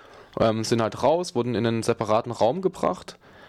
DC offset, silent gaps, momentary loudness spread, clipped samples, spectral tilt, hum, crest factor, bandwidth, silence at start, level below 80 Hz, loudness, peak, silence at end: under 0.1%; none; 5 LU; under 0.1%; -5.5 dB/octave; none; 16 dB; 14.5 kHz; 0.15 s; -56 dBFS; -24 LUFS; -10 dBFS; 0.35 s